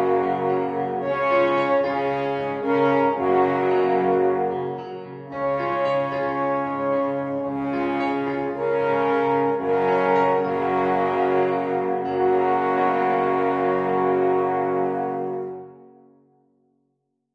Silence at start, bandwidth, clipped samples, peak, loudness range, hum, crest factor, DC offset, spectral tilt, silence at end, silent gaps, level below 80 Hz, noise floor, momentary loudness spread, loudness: 0 s; 6.8 kHz; under 0.1%; -6 dBFS; 4 LU; none; 16 dB; under 0.1%; -8 dB/octave; 1.5 s; none; -62 dBFS; -74 dBFS; 6 LU; -22 LUFS